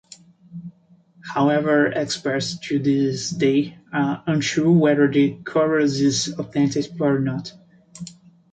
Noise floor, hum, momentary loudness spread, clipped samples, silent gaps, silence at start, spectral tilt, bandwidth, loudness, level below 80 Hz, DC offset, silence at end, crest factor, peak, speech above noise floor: -54 dBFS; none; 21 LU; under 0.1%; none; 0.5 s; -5.5 dB/octave; 9.2 kHz; -20 LUFS; -60 dBFS; under 0.1%; 0.4 s; 16 dB; -6 dBFS; 34 dB